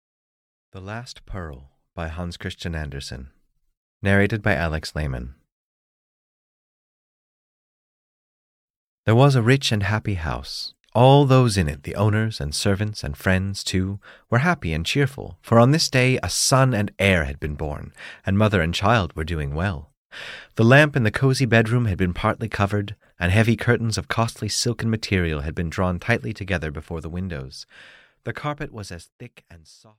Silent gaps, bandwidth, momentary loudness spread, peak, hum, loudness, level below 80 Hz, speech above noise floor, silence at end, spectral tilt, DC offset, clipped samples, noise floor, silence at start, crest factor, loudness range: 3.77-4.00 s, 5.52-9.04 s, 10.80-10.84 s, 19.97-20.10 s, 29.12-29.19 s; 15.5 kHz; 18 LU; -4 dBFS; none; -21 LUFS; -40 dBFS; over 69 dB; 0.4 s; -5.5 dB/octave; under 0.1%; under 0.1%; under -90 dBFS; 0.75 s; 18 dB; 12 LU